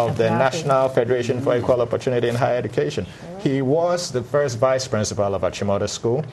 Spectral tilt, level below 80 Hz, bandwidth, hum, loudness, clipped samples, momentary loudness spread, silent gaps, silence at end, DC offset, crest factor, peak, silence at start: -5.5 dB/octave; -52 dBFS; 12.5 kHz; none; -21 LUFS; under 0.1%; 5 LU; none; 0 s; under 0.1%; 18 dB; -4 dBFS; 0 s